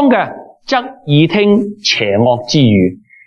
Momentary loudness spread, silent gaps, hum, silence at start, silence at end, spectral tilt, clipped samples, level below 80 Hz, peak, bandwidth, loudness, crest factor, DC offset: 7 LU; none; none; 0 s; 0.3 s; -6 dB/octave; under 0.1%; -52 dBFS; 0 dBFS; 7 kHz; -12 LUFS; 12 dB; under 0.1%